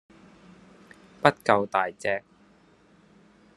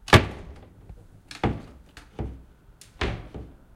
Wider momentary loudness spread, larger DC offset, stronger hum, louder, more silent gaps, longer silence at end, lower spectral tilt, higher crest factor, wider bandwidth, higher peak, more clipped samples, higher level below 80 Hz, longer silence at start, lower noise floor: second, 8 LU vs 25 LU; neither; neither; about the same, -25 LUFS vs -27 LUFS; neither; first, 1.35 s vs 0.3 s; about the same, -5.5 dB/octave vs -5 dB/octave; about the same, 28 dB vs 26 dB; second, 12.5 kHz vs 16 kHz; about the same, 0 dBFS vs -2 dBFS; neither; second, -70 dBFS vs -38 dBFS; first, 1.25 s vs 0.1 s; first, -59 dBFS vs -52 dBFS